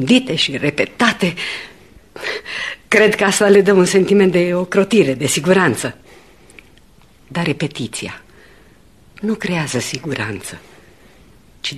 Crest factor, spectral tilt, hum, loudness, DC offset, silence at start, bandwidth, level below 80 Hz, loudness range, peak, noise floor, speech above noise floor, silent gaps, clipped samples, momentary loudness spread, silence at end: 18 dB; -4.5 dB/octave; none; -16 LUFS; 0.2%; 0 s; 13 kHz; -52 dBFS; 11 LU; 0 dBFS; -49 dBFS; 33 dB; none; under 0.1%; 15 LU; 0 s